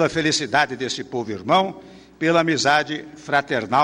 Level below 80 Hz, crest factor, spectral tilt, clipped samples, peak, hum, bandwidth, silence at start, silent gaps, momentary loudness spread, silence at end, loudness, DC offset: -58 dBFS; 16 dB; -3.5 dB/octave; under 0.1%; -6 dBFS; none; 11 kHz; 0 s; none; 10 LU; 0 s; -21 LUFS; under 0.1%